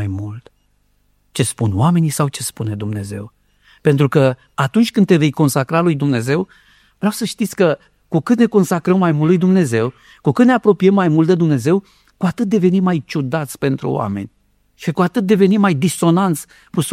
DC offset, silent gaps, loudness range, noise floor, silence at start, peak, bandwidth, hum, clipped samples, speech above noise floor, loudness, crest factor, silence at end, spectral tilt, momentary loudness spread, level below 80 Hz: under 0.1%; none; 5 LU; -60 dBFS; 0 s; 0 dBFS; 15 kHz; 50 Hz at -40 dBFS; under 0.1%; 44 dB; -16 LUFS; 14 dB; 0 s; -6.5 dB/octave; 11 LU; -56 dBFS